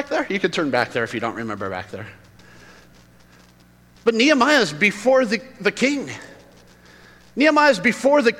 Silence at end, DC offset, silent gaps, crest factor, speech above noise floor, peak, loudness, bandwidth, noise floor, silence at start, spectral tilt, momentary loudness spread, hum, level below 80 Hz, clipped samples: 0 s; under 0.1%; none; 18 dB; 32 dB; -4 dBFS; -19 LUFS; 16 kHz; -52 dBFS; 0 s; -4 dB/octave; 17 LU; 60 Hz at -55 dBFS; -58 dBFS; under 0.1%